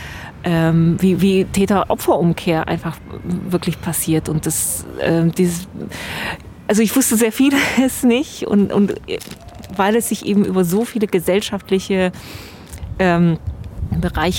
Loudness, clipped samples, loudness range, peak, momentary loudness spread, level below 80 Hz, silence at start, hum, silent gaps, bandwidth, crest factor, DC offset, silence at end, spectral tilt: -17 LUFS; under 0.1%; 3 LU; -2 dBFS; 14 LU; -38 dBFS; 0 s; none; none; 17 kHz; 14 dB; under 0.1%; 0 s; -5 dB/octave